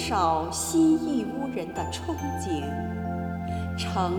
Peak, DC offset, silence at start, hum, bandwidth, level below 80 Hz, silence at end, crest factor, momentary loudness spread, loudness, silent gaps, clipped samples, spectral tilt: -12 dBFS; under 0.1%; 0 s; none; 20 kHz; -46 dBFS; 0 s; 16 dB; 9 LU; -28 LUFS; none; under 0.1%; -5 dB/octave